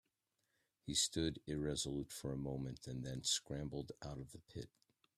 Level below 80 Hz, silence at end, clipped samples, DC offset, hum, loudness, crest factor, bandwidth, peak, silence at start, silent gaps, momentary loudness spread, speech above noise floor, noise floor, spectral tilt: -62 dBFS; 0.5 s; under 0.1%; under 0.1%; none; -42 LUFS; 20 dB; 15.5 kHz; -24 dBFS; 0.85 s; none; 16 LU; 43 dB; -86 dBFS; -3.5 dB/octave